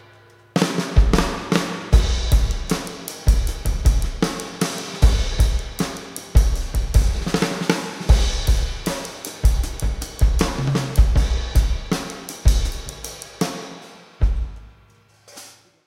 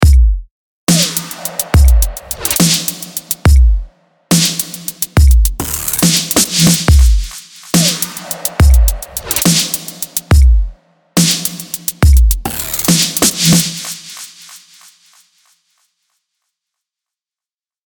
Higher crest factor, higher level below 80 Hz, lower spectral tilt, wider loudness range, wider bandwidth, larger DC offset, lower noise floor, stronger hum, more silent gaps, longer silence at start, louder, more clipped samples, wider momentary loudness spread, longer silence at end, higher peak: first, 20 dB vs 12 dB; second, -20 dBFS vs -14 dBFS; first, -5 dB/octave vs -3.5 dB/octave; about the same, 4 LU vs 3 LU; second, 16 kHz vs 19.5 kHz; neither; second, -53 dBFS vs under -90 dBFS; neither; second, none vs 0.51-0.87 s; first, 0.55 s vs 0 s; second, -22 LUFS vs -12 LUFS; neither; about the same, 11 LU vs 11 LU; second, 0.4 s vs 3.3 s; about the same, 0 dBFS vs 0 dBFS